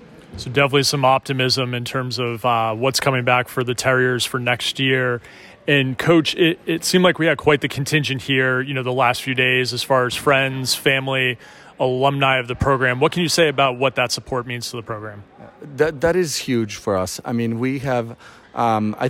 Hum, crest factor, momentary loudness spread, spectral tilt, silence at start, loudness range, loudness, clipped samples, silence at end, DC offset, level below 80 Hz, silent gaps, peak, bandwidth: none; 16 dB; 8 LU; -4.5 dB/octave; 0 s; 4 LU; -19 LUFS; under 0.1%; 0 s; under 0.1%; -48 dBFS; none; -4 dBFS; 16.5 kHz